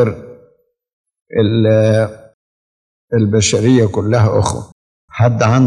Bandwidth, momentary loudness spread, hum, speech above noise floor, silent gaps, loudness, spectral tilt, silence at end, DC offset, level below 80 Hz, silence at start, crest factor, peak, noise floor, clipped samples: 10.5 kHz; 10 LU; none; 42 dB; 0.93-1.04 s, 1.22-1.26 s, 2.34-3.08 s, 4.72-5.08 s; -14 LUFS; -6 dB/octave; 0 s; under 0.1%; -48 dBFS; 0 s; 14 dB; 0 dBFS; -54 dBFS; under 0.1%